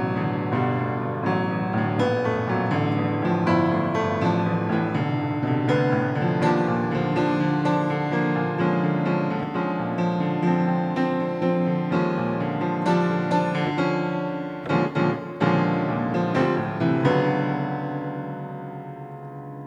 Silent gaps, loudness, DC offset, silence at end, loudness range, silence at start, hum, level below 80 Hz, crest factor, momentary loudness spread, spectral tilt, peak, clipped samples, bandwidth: none; -23 LUFS; under 0.1%; 0 s; 1 LU; 0 s; none; -60 dBFS; 16 dB; 6 LU; -8.5 dB/octave; -8 dBFS; under 0.1%; 7.8 kHz